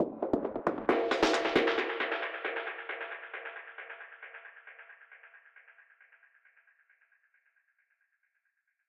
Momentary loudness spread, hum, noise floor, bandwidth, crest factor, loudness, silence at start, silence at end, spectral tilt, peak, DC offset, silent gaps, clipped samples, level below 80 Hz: 23 LU; none; -80 dBFS; 11.5 kHz; 24 dB; -32 LUFS; 0 s; 3.15 s; -4 dB/octave; -12 dBFS; under 0.1%; none; under 0.1%; -66 dBFS